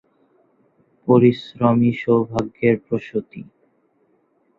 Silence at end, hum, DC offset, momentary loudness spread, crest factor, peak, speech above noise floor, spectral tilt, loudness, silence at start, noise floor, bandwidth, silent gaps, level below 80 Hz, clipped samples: 1.15 s; none; under 0.1%; 15 LU; 18 dB; -2 dBFS; 45 dB; -9 dB/octave; -19 LUFS; 1.05 s; -63 dBFS; 7 kHz; none; -56 dBFS; under 0.1%